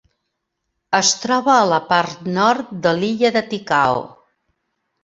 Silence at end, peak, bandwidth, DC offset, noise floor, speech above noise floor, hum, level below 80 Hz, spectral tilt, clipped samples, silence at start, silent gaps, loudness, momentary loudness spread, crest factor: 0.95 s; -2 dBFS; 7.8 kHz; under 0.1%; -76 dBFS; 58 dB; none; -60 dBFS; -3 dB/octave; under 0.1%; 0.9 s; none; -17 LUFS; 6 LU; 18 dB